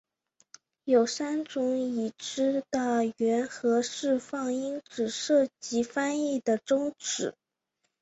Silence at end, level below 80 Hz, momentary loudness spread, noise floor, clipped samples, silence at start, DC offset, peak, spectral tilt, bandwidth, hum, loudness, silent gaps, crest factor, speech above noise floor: 0.7 s; -74 dBFS; 7 LU; -80 dBFS; under 0.1%; 0.85 s; under 0.1%; -12 dBFS; -3.5 dB/octave; 8.2 kHz; none; -29 LUFS; none; 16 dB; 52 dB